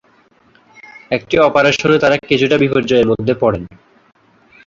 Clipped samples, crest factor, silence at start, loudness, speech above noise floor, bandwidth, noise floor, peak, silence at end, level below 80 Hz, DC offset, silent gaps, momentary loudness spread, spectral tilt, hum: under 0.1%; 14 dB; 1.1 s; -14 LUFS; 39 dB; 7.6 kHz; -52 dBFS; 0 dBFS; 1 s; -46 dBFS; under 0.1%; none; 10 LU; -5.5 dB/octave; none